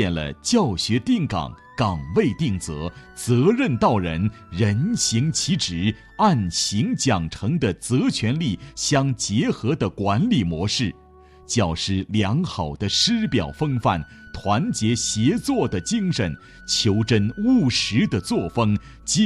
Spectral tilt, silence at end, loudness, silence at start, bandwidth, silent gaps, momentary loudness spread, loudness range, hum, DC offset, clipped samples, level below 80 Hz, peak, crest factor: -5 dB/octave; 0 s; -22 LUFS; 0 s; 13 kHz; none; 7 LU; 2 LU; none; under 0.1%; under 0.1%; -46 dBFS; -6 dBFS; 16 dB